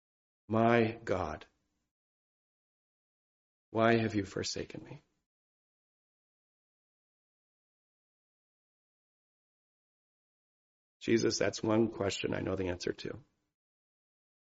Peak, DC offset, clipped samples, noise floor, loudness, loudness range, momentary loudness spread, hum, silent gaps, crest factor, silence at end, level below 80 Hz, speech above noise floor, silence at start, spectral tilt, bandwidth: -12 dBFS; under 0.1%; under 0.1%; under -90 dBFS; -32 LUFS; 7 LU; 15 LU; none; 1.91-3.72 s, 5.26-11.00 s; 26 dB; 1.25 s; -68 dBFS; over 58 dB; 0.5 s; -5 dB/octave; 7.6 kHz